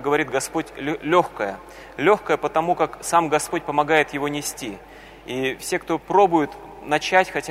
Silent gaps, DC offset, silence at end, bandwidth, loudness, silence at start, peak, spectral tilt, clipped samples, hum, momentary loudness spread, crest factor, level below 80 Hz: none; under 0.1%; 0 s; 16 kHz; -22 LUFS; 0 s; -2 dBFS; -4 dB/octave; under 0.1%; none; 13 LU; 20 dB; -52 dBFS